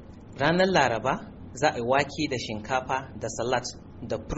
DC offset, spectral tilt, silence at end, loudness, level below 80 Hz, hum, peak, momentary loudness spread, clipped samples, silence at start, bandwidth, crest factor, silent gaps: under 0.1%; -3.5 dB/octave; 0 s; -27 LUFS; -48 dBFS; none; -8 dBFS; 13 LU; under 0.1%; 0 s; 8 kHz; 18 dB; none